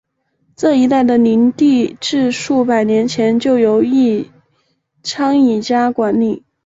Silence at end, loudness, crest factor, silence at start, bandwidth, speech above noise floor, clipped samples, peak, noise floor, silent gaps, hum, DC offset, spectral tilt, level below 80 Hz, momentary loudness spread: 0.3 s; -14 LUFS; 12 dB; 0.6 s; 7.8 kHz; 50 dB; under 0.1%; -2 dBFS; -62 dBFS; none; none; under 0.1%; -5.5 dB/octave; -56 dBFS; 7 LU